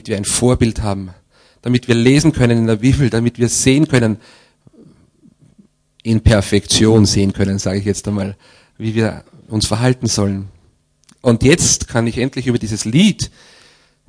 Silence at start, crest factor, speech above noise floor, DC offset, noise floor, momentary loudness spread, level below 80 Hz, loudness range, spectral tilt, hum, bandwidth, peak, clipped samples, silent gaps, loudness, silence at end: 0.05 s; 16 dB; 41 dB; under 0.1%; -55 dBFS; 13 LU; -32 dBFS; 4 LU; -5 dB/octave; none; 11 kHz; 0 dBFS; under 0.1%; none; -15 LUFS; 0.8 s